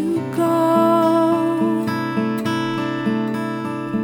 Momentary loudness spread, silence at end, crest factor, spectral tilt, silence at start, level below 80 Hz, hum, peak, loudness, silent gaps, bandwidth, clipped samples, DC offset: 8 LU; 0 s; 14 dB; -7 dB/octave; 0 s; -66 dBFS; none; -4 dBFS; -19 LUFS; none; 18.5 kHz; under 0.1%; under 0.1%